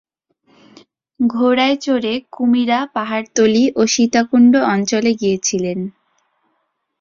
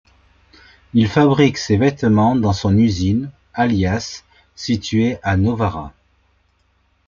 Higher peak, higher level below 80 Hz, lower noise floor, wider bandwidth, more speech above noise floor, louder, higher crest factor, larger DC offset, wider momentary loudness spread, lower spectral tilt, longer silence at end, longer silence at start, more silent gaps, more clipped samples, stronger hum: about the same, -2 dBFS vs -2 dBFS; second, -60 dBFS vs -46 dBFS; first, -69 dBFS vs -61 dBFS; about the same, 7.4 kHz vs 7.4 kHz; first, 54 dB vs 45 dB; about the same, -16 LUFS vs -17 LUFS; about the same, 14 dB vs 16 dB; neither; second, 9 LU vs 14 LU; second, -4 dB/octave vs -6.5 dB/octave; about the same, 1.1 s vs 1.2 s; first, 1.2 s vs 0.95 s; neither; neither; neither